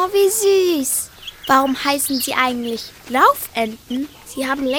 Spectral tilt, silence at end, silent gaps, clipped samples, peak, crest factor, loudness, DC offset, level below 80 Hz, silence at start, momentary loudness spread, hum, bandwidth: -2 dB/octave; 0 s; none; under 0.1%; -2 dBFS; 18 dB; -18 LUFS; under 0.1%; -52 dBFS; 0 s; 12 LU; none; 19 kHz